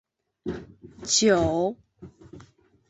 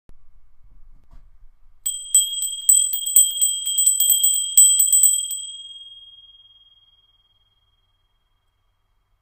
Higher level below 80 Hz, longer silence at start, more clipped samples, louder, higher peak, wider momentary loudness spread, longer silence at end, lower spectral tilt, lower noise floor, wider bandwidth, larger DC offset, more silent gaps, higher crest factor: about the same, -50 dBFS vs -54 dBFS; first, 0.45 s vs 0.1 s; neither; second, -24 LUFS vs -15 LUFS; second, -8 dBFS vs 0 dBFS; first, 20 LU vs 17 LU; second, 0.5 s vs 3.2 s; first, -3 dB/octave vs 5.5 dB/octave; second, -55 dBFS vs -67 dBFS; second, 8.2 kHz vs 16.5 kHz; neither; neither; about the same, 20 dB vs 22 dB